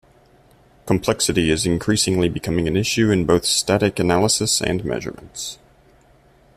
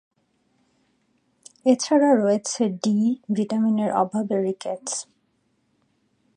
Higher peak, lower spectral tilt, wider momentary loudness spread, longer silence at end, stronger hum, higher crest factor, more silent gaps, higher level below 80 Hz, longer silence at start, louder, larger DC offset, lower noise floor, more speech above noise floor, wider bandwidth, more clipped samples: about the same, -4 dBFS vs -6 dBFS; about the same, -4 dB/octave vs -5 dB/octave; about the same, 12 LU vs 11 LU; second, 1.05 s vs 1.35 s; neither; about the same, 18 dB vs 18 dB; neither; first, -44 dBFS vs -76 dBFS; second, 0.85 s vs 1.65 s; first, -19 LUFS vs -22 LUFS; neither; second, -53 dBFS vs -69 dBFS; second, 34 dB vs 47 dB; first, 15 kHz vs 10.5 kHz; neither